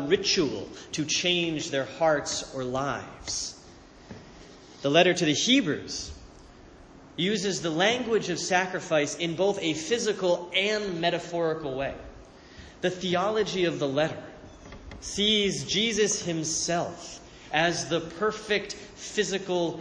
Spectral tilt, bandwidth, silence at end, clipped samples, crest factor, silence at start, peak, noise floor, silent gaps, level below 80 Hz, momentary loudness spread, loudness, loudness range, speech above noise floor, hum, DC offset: -3 dB/octave; 10.5 kHz; 0 s; under 0.1%; 20 dB; 0 s; -8 dBFS; -50 dBFS; none; -56 dBFS; 17 LU; -27 LUFS; 3 LU; 23 dB; none; under 0.1%